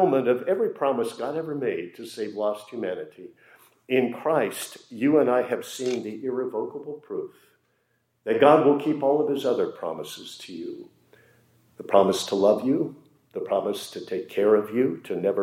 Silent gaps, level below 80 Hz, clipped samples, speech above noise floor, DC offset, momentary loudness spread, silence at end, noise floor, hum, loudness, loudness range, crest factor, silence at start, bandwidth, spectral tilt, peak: none; -80 dBFS; under 0.1%; 47 dB; under 0.1%; 16 LU; 0 s; -71 dBFS; none; -25 LUFS; 5 LU; 22 dB; 0 s; 16 kHz; -5.5 dB/octave; -4 dBFS